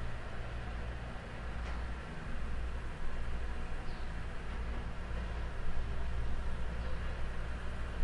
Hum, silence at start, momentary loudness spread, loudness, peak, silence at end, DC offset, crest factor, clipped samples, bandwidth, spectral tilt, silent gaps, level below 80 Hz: none; 0 s; 3 LU; -43 LUFS; -20 dBFS; 0 s; under 0.1%; 14 dB; under 0.1%; 10.5 kHz; -6 dB/octave; none; -38 dBFS